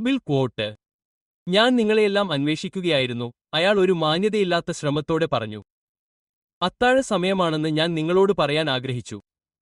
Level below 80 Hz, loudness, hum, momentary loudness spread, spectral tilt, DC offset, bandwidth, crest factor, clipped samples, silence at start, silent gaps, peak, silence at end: -56 dBFS; -22 LUFS; none; 12 LU; -5.5 dB/octave; under 0.1%; 11.5 kHz; 18 dB; under 0.1%; 0 s; 0.93-0.99 s, 1.05-1.46 s, 5.72-6.61 s; -4 dBFS; 0.4 s